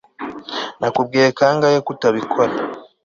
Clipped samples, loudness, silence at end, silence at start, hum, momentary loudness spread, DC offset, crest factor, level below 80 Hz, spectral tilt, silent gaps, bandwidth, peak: under 0.1%; -18 LUFS; 0.2 s; 0.2 s; none; 13 LU; under 0.1%; 16 dB; -60 dBFS; -5 dB/octave; none; 7.4 kHz; -2 dBFS